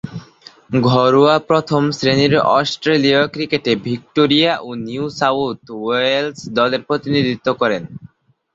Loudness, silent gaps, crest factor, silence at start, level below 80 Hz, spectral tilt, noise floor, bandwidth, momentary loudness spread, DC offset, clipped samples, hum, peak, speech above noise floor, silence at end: -16 LUFS; none; 16 dB; 0.05 s; -52 dBFS; -6 dB/octave; -45 dBFS; 7.8 kHz; 11 LU; under 0.1%; under 0.1%; none; 0 dBFS; 29 dB; 0.5 s